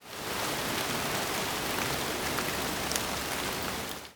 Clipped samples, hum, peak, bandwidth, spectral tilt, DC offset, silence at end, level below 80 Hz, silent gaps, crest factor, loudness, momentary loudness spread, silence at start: under 0.1%; none; -6 dBFS; over 20 kHz; -2.5 dB/octave; under 0.1%; 0 s; -52 dBFS; none; 28 dB; -31 LUFS; 3 LU; 0 s